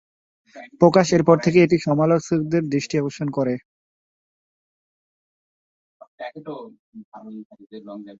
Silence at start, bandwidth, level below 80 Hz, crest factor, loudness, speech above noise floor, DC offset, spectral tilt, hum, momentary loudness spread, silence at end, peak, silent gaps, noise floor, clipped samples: 0.55 s; 7.8 kHz; -60 dBFS; 20 dB; -19 LUFS; over 70 dB; under 0.1%; -6.5 dB/octave; none; 23 LU; 0.05 s; -2 dBFS; 3.65-6.00 s, 6.07-6.18 s, 6.79-6.92 s, 7.05-7.12 s, 7.45-7.50 s; under -90 dBFS; under 0.1%